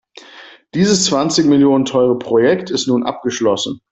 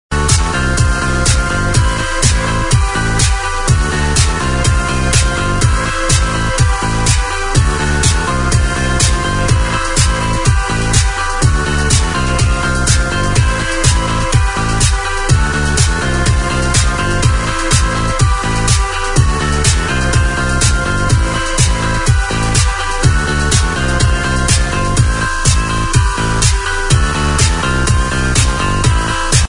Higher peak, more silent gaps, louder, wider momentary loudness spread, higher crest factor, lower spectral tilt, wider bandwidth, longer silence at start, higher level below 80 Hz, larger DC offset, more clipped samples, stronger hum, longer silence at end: about the same, -2 dBFS vs 0 dBFS; neither; about the same, -15 LUFS vs -13 LUFS; first, 6 LU vs 2 LU; about the same, 14 dB vs 12 dB; about the same, -4.5 dB/octave vs -4 dB/octave; second, 8.4 kHz vs 11 kHz; first, 0.35 s vs 0.1 s; second, -54 dBFS vs -18 dBFS; neither; neither; neither; first, 0.15 s vs 0 s